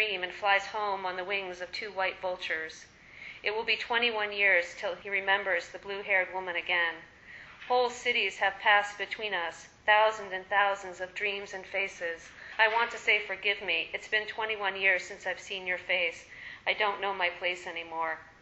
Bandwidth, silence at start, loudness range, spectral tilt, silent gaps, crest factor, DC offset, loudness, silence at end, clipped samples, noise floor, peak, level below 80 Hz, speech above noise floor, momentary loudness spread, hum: 8.2 kHz; 0 s; 4 LU; -1.5 dB/octave; none; 20 dB; under 0.1%; -29 LUFS; 0.1 s; under 0.1%; -50 dBFS; -10 dBFS; -68 dBFS; 20 dB; 12 LU; none